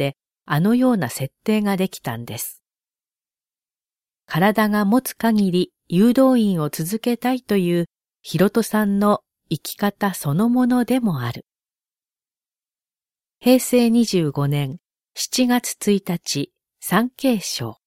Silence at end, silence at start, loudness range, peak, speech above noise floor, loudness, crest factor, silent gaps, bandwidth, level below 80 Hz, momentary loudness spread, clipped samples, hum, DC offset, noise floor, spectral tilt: 0.15 s; 0 s; 5 LU; -4 dBFS; over 71 dB; -20 LUFS; 18 dB; none; 16.5 kHz; -60 dBFS; 12 LU; under 0.1%; none; under 0.1%; under -90 dBFS; -5.5 dB/octave